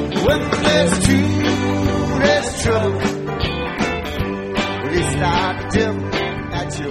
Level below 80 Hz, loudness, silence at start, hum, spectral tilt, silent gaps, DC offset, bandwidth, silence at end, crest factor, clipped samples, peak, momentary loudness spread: -32 dBFS; -18 LUFS; 0 s; none; -5 dB/octave; none; under 0.1%; 15 kHz; 0 s; 18 dB; under 0.1%; 0 dBFS; 7 LU